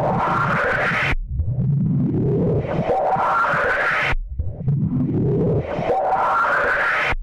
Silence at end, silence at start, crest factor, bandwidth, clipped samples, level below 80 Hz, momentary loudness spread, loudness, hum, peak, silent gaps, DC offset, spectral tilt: 0 s; 0 s; 8 dB; 10.5 kHz; under 0.1%; -32 dBFS; 5 LU; -20 LUFS; none; -10 dBFS; none; under 0.1%; -7.5 dB/octave